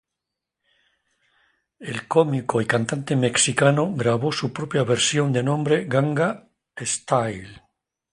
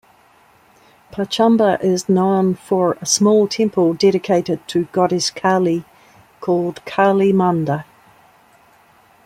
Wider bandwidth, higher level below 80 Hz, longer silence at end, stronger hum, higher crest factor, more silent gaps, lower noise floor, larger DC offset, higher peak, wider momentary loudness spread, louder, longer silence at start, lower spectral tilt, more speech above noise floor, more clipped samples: second, 11.5 kHz vs 15 kHz; about the same, -60 dBFS vs -60 dBFS; second, 0.55 s vs 1.45 s; neither; about the same, 20 dB vs 16 dB; neither; first, -84 dBFS vs -52 dBFS; neither; about the same, -2 dBFS vs -2 dBFS; first, 12 LU vs 9 LU; second, -22 LUFS vs -17 LUFS; first, 1.8 s vs 1.15 s; about the same, -4.5 dB/octave vs -5 dB/octave; first, 63 dB vs 36 dB; neither